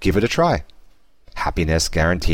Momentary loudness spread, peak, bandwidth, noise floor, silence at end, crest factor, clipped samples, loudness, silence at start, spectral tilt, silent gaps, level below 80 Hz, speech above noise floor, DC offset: 8 LU; -6 dBFS; 16.5 kHz; -52 dBFS; 0 s; 14 dB; under 0.1%; -20 LUFS; 0 s; -5 dB/octave; none; -28 dBFS; 33 dB; under 0.1%